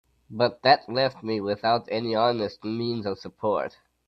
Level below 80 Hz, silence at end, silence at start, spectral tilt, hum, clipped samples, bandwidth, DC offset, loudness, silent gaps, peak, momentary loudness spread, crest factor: -66 dBFS; 0.4 s; 0.3 s; -7 dB/octave; none; under 0.1%; 6.4 kHz; under 0.1%; -25 LUFS; none; -4 dBFS; 10 LU; 22 dB